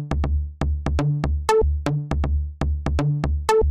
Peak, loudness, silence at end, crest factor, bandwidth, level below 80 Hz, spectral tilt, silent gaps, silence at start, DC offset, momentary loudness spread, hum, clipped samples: -6 dBFS; -23 LUFS; 0 s; 16 dB; 11.5 kHz; -24 dBFS; -7 dB/octave; none; 0 s; 0.3%; 6 LU; none; under 0.1%